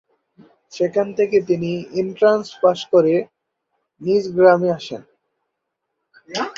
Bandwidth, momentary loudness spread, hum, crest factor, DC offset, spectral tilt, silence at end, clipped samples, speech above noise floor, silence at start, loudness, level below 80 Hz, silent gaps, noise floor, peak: 7.6 kHz; 15 LU; none; 18 dB; under 0.1%; -6 dB/octave; 0.05 s; under 0.1%; 60 dB; 0.75 s; -18 LUFS; -64 dBFS; none; -77 dBFS; -2 dBFS